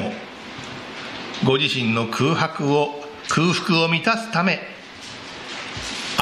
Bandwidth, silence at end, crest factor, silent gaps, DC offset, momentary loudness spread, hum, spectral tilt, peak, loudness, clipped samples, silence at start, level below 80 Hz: 14 kHz; 0 s; 22 dB; none; under 0.1%; 16 LU; none; -4.5 dB/octave; 0 dBFS; -21 LUFS; under 0.1%; 0 s; -56 dBFS